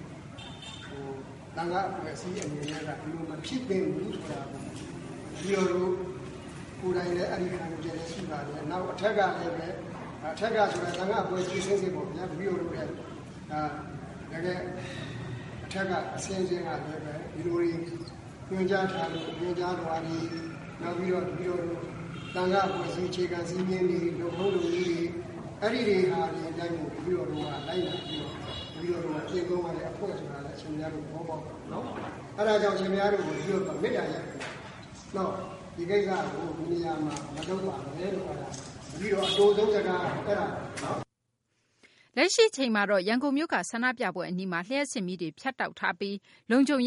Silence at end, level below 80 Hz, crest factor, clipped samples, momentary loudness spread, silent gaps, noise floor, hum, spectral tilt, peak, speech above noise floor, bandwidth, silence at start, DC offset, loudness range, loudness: 0 s; -58 dBFS; 22 dB; under 0.1%; 13 LU; none; -78 dBFS; none; -5 dB/octave; -10 dBFS; 48 dB; 11.5 kHz; 0 s; under 0.1%; 6 LU; -31 LUFS